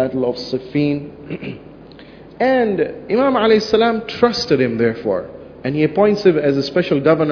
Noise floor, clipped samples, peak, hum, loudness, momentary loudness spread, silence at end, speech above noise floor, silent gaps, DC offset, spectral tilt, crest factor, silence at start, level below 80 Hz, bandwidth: -39 dBFS; under 0.1%; 0 dBFS; none; -17 LUFS; 14 LU; 0 s; 23 dB; none; under 0.1%; -6.5 dB/octave; 16 dB; 0 s; -50 dBFS; 5.4 kHz